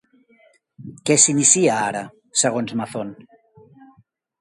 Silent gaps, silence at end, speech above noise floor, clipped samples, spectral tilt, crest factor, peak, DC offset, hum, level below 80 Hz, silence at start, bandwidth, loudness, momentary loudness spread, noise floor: none; 1.25 s; 39 dB; under 0.1%; -3 dB/octave; 22 dB; 0 dBFS; under 0.1%; none; -66 dBFS; 0.8 s; 12 kHz; -17 LUFS; 17 LU; -58 dBFS